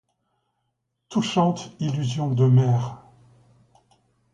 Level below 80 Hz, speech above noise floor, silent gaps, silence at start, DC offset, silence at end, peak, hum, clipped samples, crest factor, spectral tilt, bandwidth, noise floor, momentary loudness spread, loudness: -62 dBFS; 56 dB; none; 1.1 s; under 0.1%; 1.35 s; -8 dBFS; none; under 0.1%; 18 dB; -7 dB/octave; 7.8 kHz; -77 dBFS; 11 LU; -23 LUFS